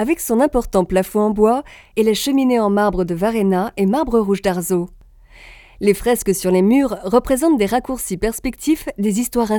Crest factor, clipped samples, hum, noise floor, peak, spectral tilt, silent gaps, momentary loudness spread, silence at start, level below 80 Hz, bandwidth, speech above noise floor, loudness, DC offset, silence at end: 18 dB; under 0.1%; none; -44 dBFS; 0 dBFS; -5.5 dB/octave; none; 6 LU; 0 s; -38 dBFS; 19.5 kHz; 27 dB; -17 LUFS; under 0.1%; 0 s